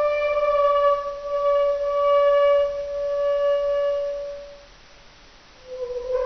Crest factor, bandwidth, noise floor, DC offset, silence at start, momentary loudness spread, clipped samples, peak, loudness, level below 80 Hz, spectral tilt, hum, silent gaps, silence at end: 12 dB; 6.4 kHz; -49 dBFS; under 0.1%; 0 s; 14 LU; under 0.1%; -10 dBFS; -21 LUFS; -50 dBFS; 0 dB/octave; none; none; 0 s